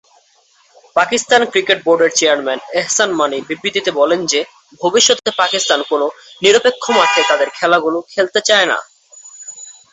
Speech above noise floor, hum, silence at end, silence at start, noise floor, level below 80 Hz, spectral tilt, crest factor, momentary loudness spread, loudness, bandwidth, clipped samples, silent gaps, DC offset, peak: 39 dB; none; 0.2 s; 0.95 s; -54 dBFS; -62 dBFS; -1 dB/octave; 16 dB; 9 LU; -14 LUFS; 8.4 kHz; under 0.1%; none; under 0.1%; 0 dBFS